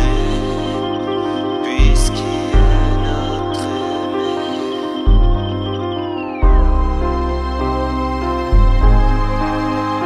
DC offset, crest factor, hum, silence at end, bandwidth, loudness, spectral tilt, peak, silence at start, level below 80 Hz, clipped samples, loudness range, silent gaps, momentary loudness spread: under 0.1%; 14 dB; none; 0 s; 11 kHz; -18 LUFS; -6.5 dB/octave; -2 dBFS; 0 s; -16 dBFS; under 0.1%; 2 LU; none; 6 LU